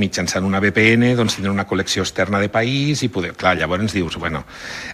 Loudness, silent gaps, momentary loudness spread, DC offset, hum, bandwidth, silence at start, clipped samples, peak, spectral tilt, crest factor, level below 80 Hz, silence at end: -18 LUFS; none; 10 LU; under 0.1%; none; 15 kHz; 0 s; under 0.1%; 0 dBFS; -4.5 dB/octave; 18 dB; -44 dBFS; 0 s